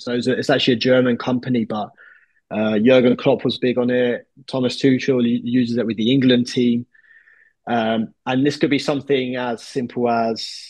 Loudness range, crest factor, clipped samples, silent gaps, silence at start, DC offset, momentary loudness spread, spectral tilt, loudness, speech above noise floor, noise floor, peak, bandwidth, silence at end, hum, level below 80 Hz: 3 LU; 16 dB; under 0.1%; none; 0 s; under 0.1%; 10 LU; -6 dB/octave; -19 LUFS; 35 dB; -53 dBFS; -2 dBFS; 9.8 kHz; 0 s; none; -64 dBFS